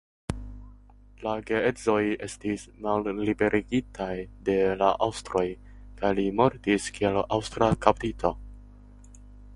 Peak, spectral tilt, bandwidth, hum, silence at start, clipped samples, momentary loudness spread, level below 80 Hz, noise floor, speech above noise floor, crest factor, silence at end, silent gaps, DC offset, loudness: -2 dBFS; -5.5 dB/octave; 11.5 kHz; 50 Hz at -50 dBFS; 0.3 s; under 0.1%; 11 LU; -46 dBFS; -52 dBFS; 25 dB; 26 dB; 0 s; none; under 0.1%; -27 LUFS